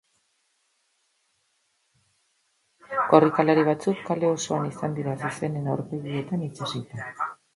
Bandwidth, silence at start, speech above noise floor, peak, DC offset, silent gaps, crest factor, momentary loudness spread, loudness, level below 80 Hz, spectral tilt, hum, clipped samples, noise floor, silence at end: 11.5 kHz; 2.9 s; 47 dB; -2 dBFS; under 0.1%; none; 24 dB; 13 LU; -25 LUFS; -68 dBFS; -6 dB/octave; none; under 0.1%; -71 dBFS; 0.2 s